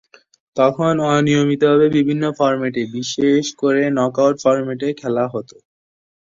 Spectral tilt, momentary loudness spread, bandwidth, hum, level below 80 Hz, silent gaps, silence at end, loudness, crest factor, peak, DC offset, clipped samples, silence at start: -6 dB/octave; 9 LU; 7.6 kHz; none; -58 dBFS; none; 0.85 s; -17 LUFS; 14 dB; -2 dBFS; under 0.1%; under 0.1%; 0.55 s